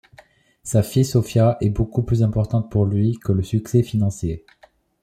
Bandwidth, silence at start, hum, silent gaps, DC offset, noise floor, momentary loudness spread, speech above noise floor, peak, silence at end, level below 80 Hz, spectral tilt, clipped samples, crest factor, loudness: 14 kHz; 0.65 s; none; none; under 0.1%; -52 dBFS; 5 LU; 33 dB; -6 dBFS; 0.65 s; -40 dBFS; -7.5 dB/octave; under 0.1%; 14 dB; -20 LUFS